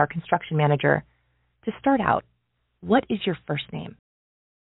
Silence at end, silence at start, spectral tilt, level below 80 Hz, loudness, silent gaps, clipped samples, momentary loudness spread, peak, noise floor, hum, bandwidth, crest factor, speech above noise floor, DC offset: 0.75 s; 0 s; -5 dB/octave; -58 dBFS; -24 LUFS; none; under 0.1%; 14 LU; -4 dBFS; -73 dBFS; none; 4 kHz; 22 dB; 49 dB; under 0.1%